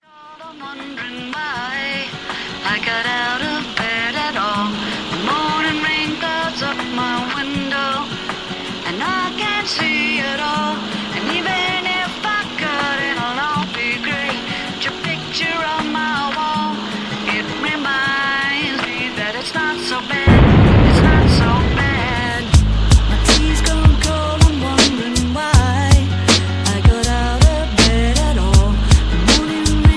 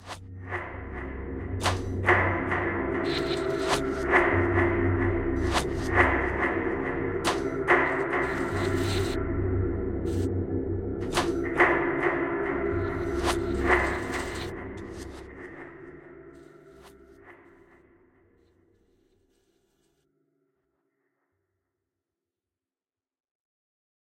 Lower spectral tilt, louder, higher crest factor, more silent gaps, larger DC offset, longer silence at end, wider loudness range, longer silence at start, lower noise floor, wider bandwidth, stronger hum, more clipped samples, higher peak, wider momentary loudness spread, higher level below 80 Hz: about the same, -4.5 dB/octave vs -5.5 dB/octave; first, -17 LUFS vs -27 LUFS; second, 16 dB vs 24 dB; neither; neither; second, 0 s vs 6.75 s; about the same, 6 LU vs 7 LU; first, 0.2 s vs 0 s; second, -38 dBFS vs under -90 dBFS; second, 11 kHz vs 16 kHz; neither; neither; first, 0 dBFS vs -6 dBFS; second, 9 LU vs 16 LU; first, -22 dBFS vs -42 dBFS